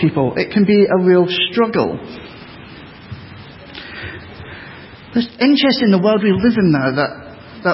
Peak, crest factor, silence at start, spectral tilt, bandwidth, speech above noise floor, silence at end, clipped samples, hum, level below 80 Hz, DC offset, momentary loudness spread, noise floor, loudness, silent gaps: -2 dBFS; 14 dB; 0 s; -10.5 dB/octave; 5.8 kHz; 22 dB; 0 s; under 0.1%; none; -46 dBFS; under 0.1%; 23 LU; -37 dBFS; -15 LUFS; none